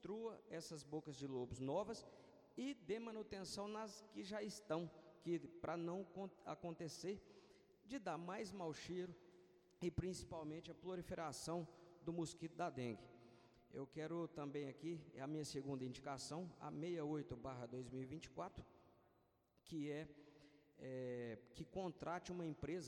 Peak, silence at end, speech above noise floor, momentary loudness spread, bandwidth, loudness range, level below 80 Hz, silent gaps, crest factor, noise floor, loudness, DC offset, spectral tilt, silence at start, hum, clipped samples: -32 dBFS; 0 s; 30 dB; 9 LU; 16.5 kHz; 3 LU; -72 dBFS; none; 18 dB; -79 dBFS; -50 LUFS; under 0.1%; -5.5 dB/octave; 0 s; none; under 0.1%